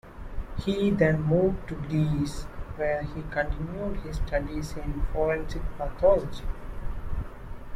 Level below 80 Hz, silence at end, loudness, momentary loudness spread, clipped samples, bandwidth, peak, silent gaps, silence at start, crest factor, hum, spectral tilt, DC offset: -34 dBFS; 0 s; -28 LUFS; 16 LU; under 0.1%; 14 kHz; -10 dBFS; none; 0.05 s; 18 dB; none; -7.5 dB/octave; under 0.1%